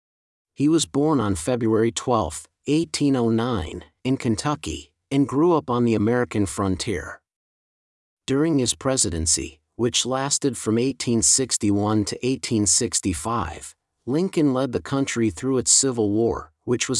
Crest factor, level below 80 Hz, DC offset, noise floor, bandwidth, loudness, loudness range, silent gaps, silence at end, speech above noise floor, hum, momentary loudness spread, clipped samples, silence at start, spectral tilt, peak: 18 dB; -50 dBFS; under 0.1%; under -90 dBFS; 12 kHz; -22 LUFS; 3 LU; 7.36-8.17 s; 0 s; over 68 dB; none; 11 LU; under 0.1%; 0.6 s; -4 dB/octave; -4 dBFS